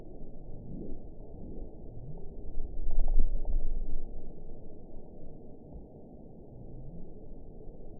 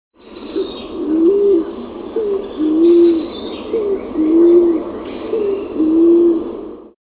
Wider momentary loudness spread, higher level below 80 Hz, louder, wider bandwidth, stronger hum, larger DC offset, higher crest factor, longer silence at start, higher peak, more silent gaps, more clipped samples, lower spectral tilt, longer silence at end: about the same, 15 LU vs 16 LU; first, -34 dBFS vs -48 dBFS; second, -44 LUFS vs -15 LUFS; second, 0.9 kHz vs 4 kHz; neither; first, 0.2% vs under 0.1%; about the same, 18 dB vs 14 dB; second, 0 s vs 0.25 s; second, -10 dBFS vs -2 dBFS; neither; neither; first, -15.5 dB/octave vs -11 dB/octave; second, 0 s vs 0.2 s